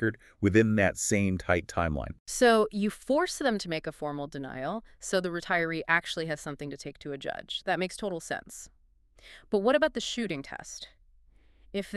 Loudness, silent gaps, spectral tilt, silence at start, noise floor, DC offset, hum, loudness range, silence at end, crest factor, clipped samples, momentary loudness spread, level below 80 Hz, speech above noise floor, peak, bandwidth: -29 LUFS; 2.20-2.26 s; -4.5 dB/octave; 0 s; -60 dBFS; under 0.1%; none; 6 LU; 0 s; 20 dB; under 0.1%; 14 LU; -52 dBFS; 31 dB; -10 dBFS; 13.5 kHz